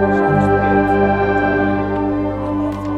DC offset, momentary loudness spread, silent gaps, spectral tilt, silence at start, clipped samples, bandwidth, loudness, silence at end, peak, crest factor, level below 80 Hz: under 0.1%; 6 LU; none; -9 dB/octave; 0 s; under 0.1%; 8.2 kHz; -16 LUFS; 0 s; -2 dBFS; 14 dB; -34 dBFS